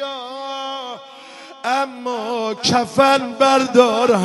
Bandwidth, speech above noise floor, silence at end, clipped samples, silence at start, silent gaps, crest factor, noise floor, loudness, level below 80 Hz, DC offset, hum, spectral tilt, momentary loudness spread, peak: 11.5 kHz; 23 dB; 0 s; under 0.1%; 0 s; none; 18 dB; -39 dBFS; -18 LUFS; -62 dBFS; under 0.1%; none; -4 dB/octave; 19 LU; 0 dBFS